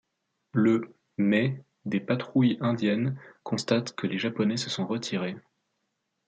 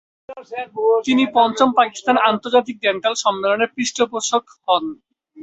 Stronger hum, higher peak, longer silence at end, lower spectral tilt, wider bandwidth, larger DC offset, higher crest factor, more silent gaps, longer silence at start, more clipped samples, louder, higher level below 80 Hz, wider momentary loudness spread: neither; second, -10 dBFS vs -2 dBFS; first, 0.9 s vs 0 s; first, -6 dB/octave vs -2.5 dB/octave; first, 9.2 kHz vs 8.2 kHz; neither; about the same, 18 dB vs 16 dB; neither; first, 0.55 s vs 0.3 s; neither; second, -28 LUFS vs -18 LUFS; second, -72 dBFS vs -64 dBFS; about the same, 9 LU vs 9 LU